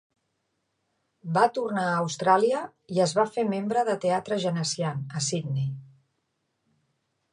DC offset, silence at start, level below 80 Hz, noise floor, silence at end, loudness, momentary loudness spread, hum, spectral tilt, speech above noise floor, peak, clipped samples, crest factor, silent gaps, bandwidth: under 0.1%; 1.25 s; -74 dBFS; -77 dBFS; 1.45 s; -26 LUFS; 8 LU; none; -5 dB/octave; 51 dB; -8 dBFS; under 0.1%; 20 dB; none; 11 kHz